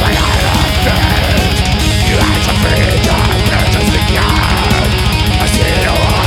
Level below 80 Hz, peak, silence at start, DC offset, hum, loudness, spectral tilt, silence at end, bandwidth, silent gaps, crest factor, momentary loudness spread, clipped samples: -16 dBFS; 0 dBFS; 0 s; under 0.1%; none; -11 LUFS; -4.5 dB/octave; 0 s; 17 kHz; none; 10 dB; 1 LU; under 0.1%